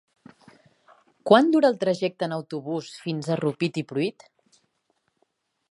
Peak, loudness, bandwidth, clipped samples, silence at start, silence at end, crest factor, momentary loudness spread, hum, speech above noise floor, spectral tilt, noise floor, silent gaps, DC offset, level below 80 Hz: -2 dBFS; -24 LUFS; 11.5 kHz; under 0.1%; 1.25 s; 1.6 s; 24 dB; 14 LU; none; 50 dB; -6.5 dB/octave; -73 dBFS; none; under 0.1%; -76 dBFS